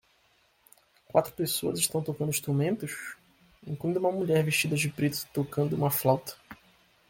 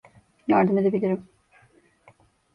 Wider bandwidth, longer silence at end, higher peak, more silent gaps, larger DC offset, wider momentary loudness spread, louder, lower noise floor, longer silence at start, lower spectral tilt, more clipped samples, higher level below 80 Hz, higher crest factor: first, 17 kHz vs 5.2 kHz; second, 0.55 s vs 1.3 s; about the same, -8 dBFS vs -8 dBFS; neither; neither; about the same, 13 LU vs 12 LU; second, -28 LUFS vs -23 LUFS; first, -67 dBFS vs -59 dBFS; first, 1.15 s vs 0.5 s; second, -4.5 dB/octave vs -10 dB/octave; neither; about the same, -64 dBFS vs -66 dBFS; about the same, 22 dB vs 18 dB